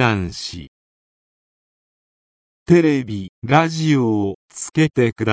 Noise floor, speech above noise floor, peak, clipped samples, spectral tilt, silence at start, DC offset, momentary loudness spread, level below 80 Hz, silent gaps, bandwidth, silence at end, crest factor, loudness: under -90 dBFS; over 72 dB; 0 dBFS; under 0.1%; -6 dB/octave; 0 s; under 0.1%; 14 LU; -46 dBFS; 0.68-2.66 s, 3.29-3.42 s, 4.35-4.49 s; 8 kHz; 0 s; 20 dB; -18 LUFS